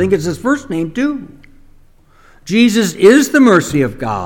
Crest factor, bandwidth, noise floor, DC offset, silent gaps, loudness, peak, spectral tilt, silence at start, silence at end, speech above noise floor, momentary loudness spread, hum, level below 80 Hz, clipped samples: 14 dB; 18.5 kHz; -45 dBFS; under 0.1%; none; -12 LUFS; 0 dBFS; -5 dB/octave; 0 s; 0 s; 33 dB; 10 LU; none; -42 dBFS; 0.3%